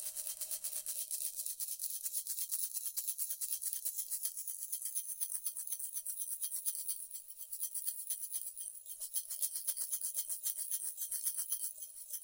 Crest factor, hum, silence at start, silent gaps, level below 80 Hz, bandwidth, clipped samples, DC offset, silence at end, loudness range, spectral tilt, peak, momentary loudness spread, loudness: 24 dB; none; 0 s; none; -86 dBFS; 17 kHz; under 0.1%; under 0.1%; 0 s; 2 LU; 5 dB/octave; -16 dBFS; 5 LU; -38 LUFS